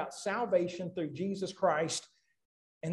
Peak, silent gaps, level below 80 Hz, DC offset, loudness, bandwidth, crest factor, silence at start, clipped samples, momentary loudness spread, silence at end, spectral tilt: -16 dBFS; 2.45-2.81 s; -76 dBFS; under 0.1%; -34 LUFS; 12 kHz; 18 dB; 0 s; under 0.1%; 7 LU; 0 s; -4.5 dB/octave